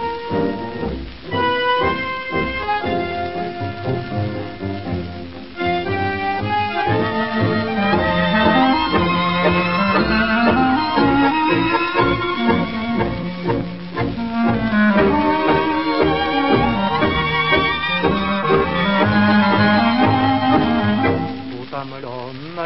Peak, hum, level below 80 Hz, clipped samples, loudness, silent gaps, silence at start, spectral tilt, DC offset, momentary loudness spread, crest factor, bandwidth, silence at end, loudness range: -2 dBFS; none; -38 dBFS; under 0.1%; -18 LUFS; none; 0 s; -10.5 dB/octave; 0.9%; 11 LU; 16 dB; 5.8 kHz; 0 s; 7 LU